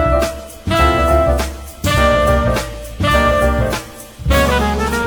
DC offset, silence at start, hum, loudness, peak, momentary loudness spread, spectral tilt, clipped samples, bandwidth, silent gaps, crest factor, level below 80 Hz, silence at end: under 0.1%; 0 s; none; -15 LUFS; 0 dBFS; 12 LU; -5.5 dB/octave; under 0.1%; over 20 kHz; none; 14 dB; -22 dBFS; 0 s